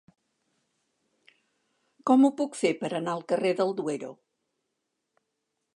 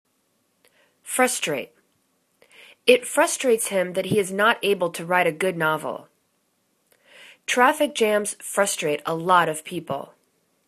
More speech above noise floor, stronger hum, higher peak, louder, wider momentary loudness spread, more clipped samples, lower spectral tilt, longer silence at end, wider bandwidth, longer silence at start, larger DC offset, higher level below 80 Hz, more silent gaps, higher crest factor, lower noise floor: first, 56 dB vs 47 dB; neither; second, -10 dBFS vs 0 dBFS; second, -27 LUFS vs -22 LUFS; about the same, 13 LU vs 12 LU; neither; first, -5.5 dB/octave vs -3 dB/octave; first, 1.6 s vs 0.65 s; second, 11 kHz vs 14 kHz; first, 2.05 s vs 1.05 s; neither; second, -86 dBFS vs -70 dBFS; neither; about the same, 20 dB vs 24 dB; first, -81 dBFS vs -69 dBFS